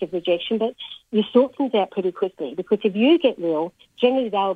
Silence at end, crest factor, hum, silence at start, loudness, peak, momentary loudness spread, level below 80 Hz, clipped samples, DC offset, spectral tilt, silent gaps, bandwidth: 0 s; 18 dB; none; 0 s; -22 LUFS; -4 dBFS; 9 LU; -68 dBFS; under 0.1%; under 0.1%; -7.5 dB/octave; none; 4.7 kHz